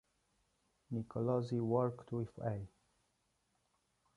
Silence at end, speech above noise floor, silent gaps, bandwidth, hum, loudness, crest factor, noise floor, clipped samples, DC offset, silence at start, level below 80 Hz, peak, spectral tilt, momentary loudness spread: 1.5 s; 43 dB; none; 10.5 kHz; none; -39 LUFS; 22 dB; -81 dBFS; under 0.1%; under 0.1%; 0.9 s; -70 dBFS; -20 dBFS; -9.5 dB/octave; 10 LU